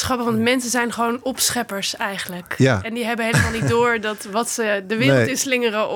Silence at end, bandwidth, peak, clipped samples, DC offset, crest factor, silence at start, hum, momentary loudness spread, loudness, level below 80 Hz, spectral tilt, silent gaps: 0 s; 19.5 kHz; -4 dBFS; under 0.1%; under 0.1%; 16 dB; 0 s; none; 6 LU; -20 LUFS; -50 dBFS; -4 dB/octave; none